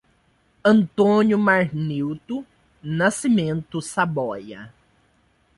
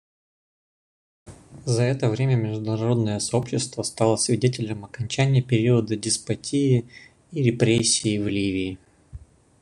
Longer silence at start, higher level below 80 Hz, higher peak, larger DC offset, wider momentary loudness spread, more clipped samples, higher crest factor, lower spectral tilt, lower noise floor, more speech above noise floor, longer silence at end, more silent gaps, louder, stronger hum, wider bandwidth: second, 0.65 s vs 1.25 s; about the same, -58 dBFS vs -54 dBFS; about the same, -4 dBFS vs -4 dBFS; neither; first, 15 LU vs 9 LU; neither; about the same, 18 dB vs 20 dB; about the same, -6 dB/octave vs -5 dB/octave; first, -62 dBFS vs -44 dBFS; first, 42 dB vs 22 dB; first, 0.9 s vs 0.45 s; neither; about the same, -21 LUFS vs -23 LUFS; neither; about the same, 11.5 kHz vs 11 kHz